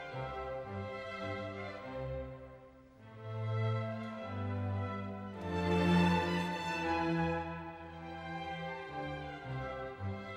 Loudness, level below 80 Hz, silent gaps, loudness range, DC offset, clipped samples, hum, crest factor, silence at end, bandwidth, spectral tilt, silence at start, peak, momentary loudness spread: -37 LUFS; -58 dBFS; none; 8 LU; under 0.1%; under 0.1%; none; 18 dB; 0 s; 11 kHz; -7 dB/octave; 0 s; -18 dBFS; 14 LU